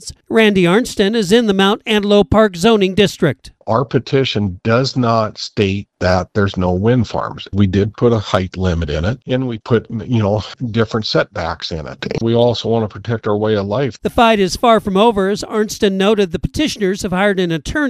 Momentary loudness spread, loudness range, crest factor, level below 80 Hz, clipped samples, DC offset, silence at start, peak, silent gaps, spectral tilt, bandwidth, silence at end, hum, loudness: 8 LU; 4 LU; 16 dB; -36 dBFS; under 0.1%; under 0.1%; 0 s; 0 dBFS; none; -6 dB/octave; 14 kHz; 0 s; none; -15 LUFS